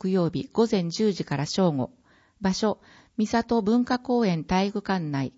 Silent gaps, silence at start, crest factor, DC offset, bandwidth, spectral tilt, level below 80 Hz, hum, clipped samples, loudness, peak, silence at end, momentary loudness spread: none; 0 s; 16 dB; under 0.1%; 8 kHz; -6 dB/octave; -54 dBFS; none; under 0.1%; -25 LUFS; -8 dBFS; 0.1 s; 7 LU